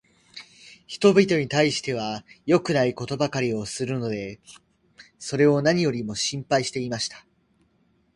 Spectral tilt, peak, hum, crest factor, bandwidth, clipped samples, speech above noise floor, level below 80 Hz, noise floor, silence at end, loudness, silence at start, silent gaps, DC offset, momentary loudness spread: -5 dB/octave; -4 dBFS; none; 22 dB; 11.5 kHz; under 0.1%; 42 dB; -60 dBFS; -65 dBFS; 0.95 s; -23 LUFS; 0.35 s; none; under 0.1%; 18 LU